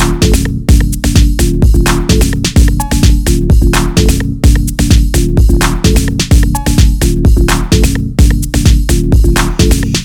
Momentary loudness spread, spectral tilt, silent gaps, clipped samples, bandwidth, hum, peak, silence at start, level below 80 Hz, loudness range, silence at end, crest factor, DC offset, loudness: 2 LU; -5 dB/octave; none; 1%; 18 kHz; none; 0 dBFS; 0 s; -10 dBFS; 0 LU; 0 s; 8 dB; under 0.1%; -10 LUFS